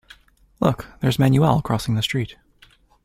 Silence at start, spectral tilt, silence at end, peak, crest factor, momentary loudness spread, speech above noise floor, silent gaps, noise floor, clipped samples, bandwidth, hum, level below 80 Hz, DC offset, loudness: 0.6 s; -6.5 dB/octave; 0.7 s; -2 dBFS; 20 dB; 8 LU; 35 dB; none; -54 dBFS; under 0.1%; 15.5 kHz; none; -46 dBFS; under 0.1%; -21 LUFS